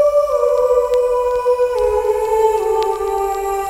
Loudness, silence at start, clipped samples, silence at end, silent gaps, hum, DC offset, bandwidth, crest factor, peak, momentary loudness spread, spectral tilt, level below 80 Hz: -16 LUFS; 0 s; under 0.1%; 0 s; none; none; under 0.1%; 16 kHz; 12 dB; -2 dBFS; 4 LU; -4 dB/octave; -40 dBFS